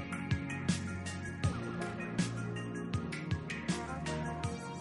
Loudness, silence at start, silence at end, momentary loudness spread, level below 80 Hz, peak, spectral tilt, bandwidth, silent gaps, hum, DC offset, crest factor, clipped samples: -38 LUFS; 0 s; 0 s; 4 LU; -54 dBFS; -18 dBFS; -5.5 dB/octave; 11.5 kHz; none; none; under 0.1%; 20 dB; under 0.1%